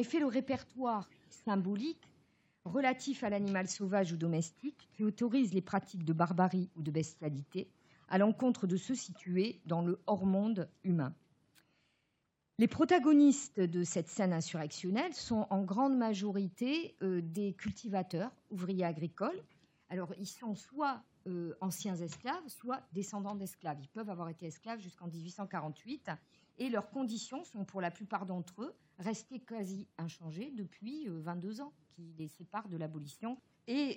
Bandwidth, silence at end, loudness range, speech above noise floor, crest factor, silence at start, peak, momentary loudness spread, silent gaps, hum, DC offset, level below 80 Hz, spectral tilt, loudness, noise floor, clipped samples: 16.5 kHz; 0 s; 12 LU; 46 dB; 20 dB; 0 s; -16 dBFS; 13 LU; none; none; under 0.1%; -78 dBFS; -6 dB/octave; -37 LUFS; -82 dBFS; under 0.1%